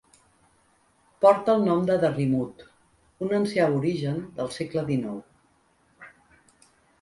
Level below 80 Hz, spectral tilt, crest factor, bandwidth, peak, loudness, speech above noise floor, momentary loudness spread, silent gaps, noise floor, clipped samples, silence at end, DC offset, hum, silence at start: -62 dBFS; -7.5 dB/octave; 22 dB; 11.5 kHz; -4 dBFS; -25 LUFS; 41 dB; 13 LU; none; -64 dBFS; under 0.1%; 0.95 s; under 0.1%; none; 1.2 s